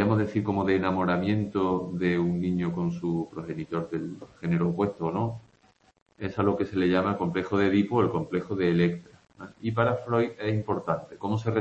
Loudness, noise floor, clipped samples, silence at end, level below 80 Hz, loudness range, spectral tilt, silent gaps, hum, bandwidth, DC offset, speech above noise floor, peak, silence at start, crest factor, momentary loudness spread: -27 LUFS; -63 dBFS; under 0.1%; 0 s; -58 dBFS; 4 LU; -8.5 dB/octave; 6.02-6.06 s; none; 7.8 kHz; under 0.1%; 36 dB; -10 dBFS; 0 s; 18 dB; 10 LU